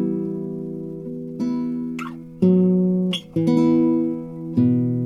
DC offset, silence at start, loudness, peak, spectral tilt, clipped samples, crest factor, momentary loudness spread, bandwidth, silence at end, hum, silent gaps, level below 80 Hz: under 0.1%; 0 s; -21 LUFS; -6 dBFS; -8.5 dB/octave; under 0.1%; 14 dB; 14 LU; 10.5 kHz; 0 s; none; none; -58 dBFS